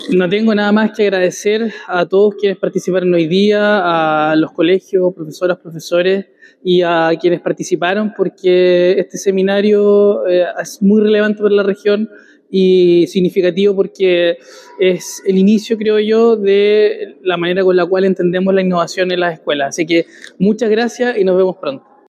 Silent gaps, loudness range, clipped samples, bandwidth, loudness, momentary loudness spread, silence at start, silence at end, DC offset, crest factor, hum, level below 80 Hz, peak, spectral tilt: none; 2 LU; under 0.1%; 13.5 kHz; -13 LUFS; 7 LU; 0 s; 0.3 s; under 0.1%; 10 dB; none; -68 dBFS; -2 dBFS; -6 dB/octave